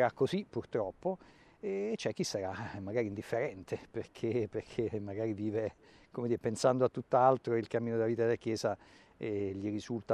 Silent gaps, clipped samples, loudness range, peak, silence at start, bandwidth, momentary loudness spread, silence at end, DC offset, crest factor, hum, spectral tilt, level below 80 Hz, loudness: none; under 0.1%; 5 LU; -14 dBFS; 0 s; 13 kHz; 11 LU; 0 s; under 0.1%; 22 dB; none; -6 dB/octave; -70 dBFS; -35 LUFS